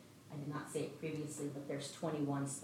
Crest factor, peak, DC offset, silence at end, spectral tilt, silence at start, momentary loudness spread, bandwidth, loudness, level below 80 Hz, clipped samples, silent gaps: 14 dB; -28 dBFS; under 0.1%; 0 s; -5.5 dB/octave; 0 s; 6 LU; 16 kHz; -43 LUFS; -82 dBFS; under 0.1%; none